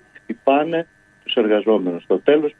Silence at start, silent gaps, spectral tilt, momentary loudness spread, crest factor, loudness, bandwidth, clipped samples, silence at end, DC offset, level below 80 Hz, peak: 0.3 s; none; -7.5 dB/octave; 16 LU; 18 dB; -19 LUFS; 3.9 kHz; under 0.1%; 0.1 s; under 0.1%; -68 dBFS; 0 dBFS